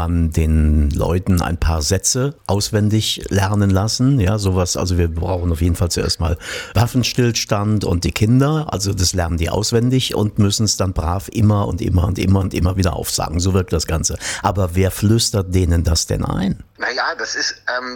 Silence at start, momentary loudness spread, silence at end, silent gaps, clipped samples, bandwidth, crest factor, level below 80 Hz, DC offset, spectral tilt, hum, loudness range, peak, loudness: 0 s; 5 LU; 0 s; none; under 0.1%; 18 kHz; 14 dB; -28 dBFS; under 0.1%; -5 dB/octave; none; 1 LU; -2 dBFS; -18 LUFS